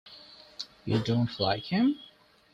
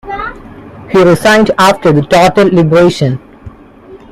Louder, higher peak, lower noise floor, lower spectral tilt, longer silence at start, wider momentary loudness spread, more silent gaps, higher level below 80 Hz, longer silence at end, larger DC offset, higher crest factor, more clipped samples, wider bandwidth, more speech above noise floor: second, -29 LUFS vs -8 LUFS; second, -12 dBFS vs 0 dBFS; first, -52 dBFS vs -35 dBFS; about the same, -7 dB/octave vs -6 dB/octave; about the same, 0.05 s vs 0.05 s; first, 20 LU vs 14 LU; neither; second, -62 dBFS vs -38 dBFS; first, 0.5 s vs 0.15 s; neither; first, 18 dB vs 10 dB; neither; second, 9.4 kHz vs 16 kHz; about the same, 25 dB vs 27 dB